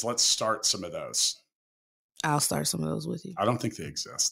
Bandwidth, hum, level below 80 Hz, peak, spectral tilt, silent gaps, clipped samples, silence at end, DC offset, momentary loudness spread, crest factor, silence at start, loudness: 16 kHz; none; -64 dBFS; -12 dBFS; -2.5 dB/octave; 1.55-2.09 s; under 0.1%; 0 s; under 0.1%; 11 LU; 18 dB; 0 s; -28 LUFS